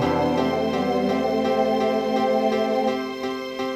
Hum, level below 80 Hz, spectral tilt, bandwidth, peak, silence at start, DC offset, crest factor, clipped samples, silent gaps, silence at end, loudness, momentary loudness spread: none; -56 dBFS; -6 dB/octave; 15.5 kHz; -10 dBFS; 0 s; under 0.1%; 12 dB; under 0.1%; none; 0 s; -23 LUFS; 7 LU